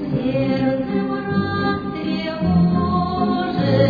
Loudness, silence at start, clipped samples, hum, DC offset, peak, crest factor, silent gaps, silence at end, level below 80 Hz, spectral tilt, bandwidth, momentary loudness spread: -20 LUFS; 0 s; under 0.1%; none; under 0.1%; -4 dBFS; 16 dB; none; 0 s; -42 dBFS; -9.5 dB/octave; 5 kHz; 6 LU